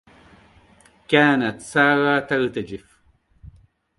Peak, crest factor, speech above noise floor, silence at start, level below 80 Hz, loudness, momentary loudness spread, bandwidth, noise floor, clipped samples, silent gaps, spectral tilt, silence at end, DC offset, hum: -2 dBFS; 20 dB; 40 dB; 1.1 s; -56 dBFS; -19 LUFS; 15 LU; 11.5 kHz; -60 dBFS; under 0.1%; none; -5.5 dB/octave; 1.2 s; under 0.1%; none